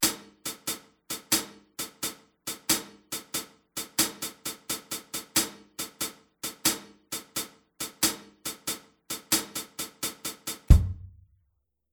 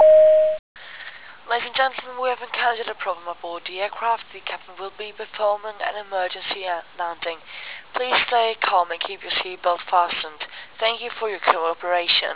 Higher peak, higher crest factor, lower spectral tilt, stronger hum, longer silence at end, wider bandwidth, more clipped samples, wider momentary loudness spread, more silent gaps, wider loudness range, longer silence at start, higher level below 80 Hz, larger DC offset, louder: about the same, -2 dBFS vs 0 dBFS; first, 28 dB vs 22 dB; second, -2.5 dB/octave vs -5 dB/octave; neither; first, 0.85 s vs 0 s; first, over 20 kHz vs 4 kHz; neither; second, 11 LU vs 15 LU; second, none vs 0.59-0.75 s; second, 2 LU vs 5 LU; about the same, 0 s vs 0 s; first, -36 dBFS vs -66 dBFS; second, under 0.1% vs 0.4%; second, -30 LUFS vs -22 LUFS